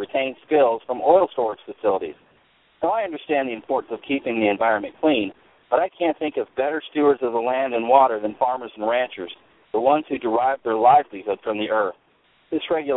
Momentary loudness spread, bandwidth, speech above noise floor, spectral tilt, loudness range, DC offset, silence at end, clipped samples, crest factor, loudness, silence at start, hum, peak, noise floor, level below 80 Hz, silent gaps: 10 LU; 4.1 kHz; 39 dB; -9.5 dB/octave; 3 LU; under 0.1%; 0 s; under 0.1%; 20 dB; -22 LUFS; 0 s; none; -2 dBFS; -60 dBFS; -64 dBFS; none